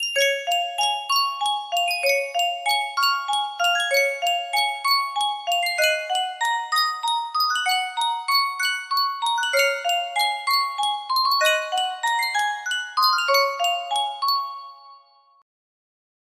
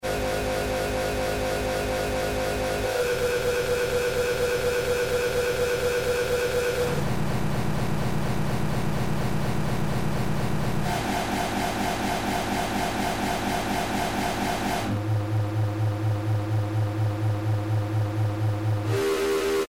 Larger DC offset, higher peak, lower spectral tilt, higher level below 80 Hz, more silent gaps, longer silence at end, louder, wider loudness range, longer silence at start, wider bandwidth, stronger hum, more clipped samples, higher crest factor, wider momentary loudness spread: neither; first, -6 dBFS vs -14 dBFS; second, 3.5 dB/octave vs -5.5 dB/octave; second, -78 dBFS vs -40 dBFS; neither; first, 1.4 s vs 0 s; first, -21 LUFS vs -26 LUFS; about the same, 1 LU vs 2 LU; about the same, 0 s vs 0 s; about the same, 16 kHz vs 17 kHz; neither; neither; first, 18 dB vs 10 dB; about the same, 5 LU vs 3 LU